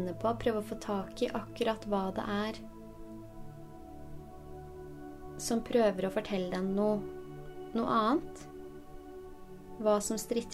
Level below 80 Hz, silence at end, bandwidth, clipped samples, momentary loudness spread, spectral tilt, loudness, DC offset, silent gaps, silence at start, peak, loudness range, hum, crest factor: -54 dBFS; 0 s; 16 kHz; under 0.1%; 20 LU; -5 dB/octave; -33 LUFS; under 0.1%; none; 0 s; -16 dBFS; 8 LU; none; 18 dB